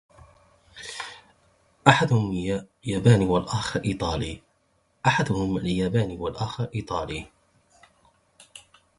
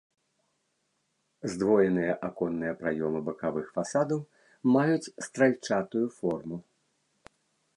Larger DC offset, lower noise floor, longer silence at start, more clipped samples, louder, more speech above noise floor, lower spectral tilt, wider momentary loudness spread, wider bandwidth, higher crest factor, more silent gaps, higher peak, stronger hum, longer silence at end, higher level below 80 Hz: neither; second, -68 dBFS vs -76 dBFS; second, 0.75 s vs 1.45 s; neither; first, -25 LUFS vs -29 LUFS; second, 44 dB vs 48 dB; about the same, -6 dB/octave vs -6.5 dB/octave; first, 16 LU vs 11 LU; about the same, 11.5 kHz vs 11.5 kHz; first, 26 dB vs 20 dB; neither; first, 0 dBFS vs -10 dBFS; neither; second, 0.4 s vs 1.15 s; first, -46 dBFS vs -66 dBFS